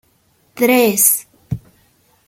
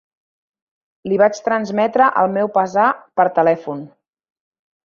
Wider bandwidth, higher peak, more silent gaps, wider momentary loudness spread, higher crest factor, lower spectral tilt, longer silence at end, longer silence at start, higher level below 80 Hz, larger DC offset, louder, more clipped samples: first, 17 kHz vs 7.2 kHz; about the same, 0 dBFS vs -2 dBFS; neither; first, 18 LU vs 8 LU; about the same, 18 dB vs 18 dB; second, -3 dB/octave vs -6 dB/octave; second, 0.7 s vs 1 s; second, 0.55 s vs 1.05 s; first, -48 dBFS vs -66 dBFS; neither; first, -13 LUFS vs -17 LUFS; neither